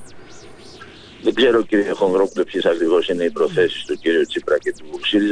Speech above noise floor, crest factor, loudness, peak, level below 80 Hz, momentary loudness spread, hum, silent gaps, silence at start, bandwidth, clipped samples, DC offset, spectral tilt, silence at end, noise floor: 22 dB; 14 dB; -19 LUFS; -4 dBFS; -54 dBFS; 7 LU; none; none; 0 s; 10.5 kHz; under 0.1%; under 0.1%; -5 dB/octave; 0 s; -40 dBFS